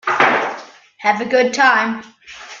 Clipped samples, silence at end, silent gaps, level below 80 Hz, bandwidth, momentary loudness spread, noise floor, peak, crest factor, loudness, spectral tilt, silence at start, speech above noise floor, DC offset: under 0.1%; 0 s; none; -64 dBFS; 7.6 kHz; 20 LU; -36 dBFS; 0 dBFS; 18 dB; -15 LUFS; -3 dB/octave; 0.05 s; 20 dB; under 0.1%